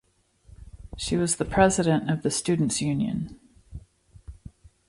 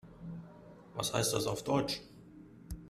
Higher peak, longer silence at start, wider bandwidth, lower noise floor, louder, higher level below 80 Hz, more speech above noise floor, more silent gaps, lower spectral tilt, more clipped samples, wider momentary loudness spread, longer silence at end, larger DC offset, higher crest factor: first, -6 dBFS vs -14 dBFS; first, 0.6 s vs 0.05 s; second, 11.5 kHz vs 15.5 kHz; first, -58 dBFS vs -54 dBFS; first, -25 LUFS vs -34 LUFS; first, -46 dBFS vs -56 dBFS; first, 34 dB vs 21 dB; neither; about the same, -5 dB/octave vs -4 dB/octave; neither; about the same, 25 LU vs 23 LU; first, 0.4 s vs 0 s; neither; about the same, 22 dB vs 24 dB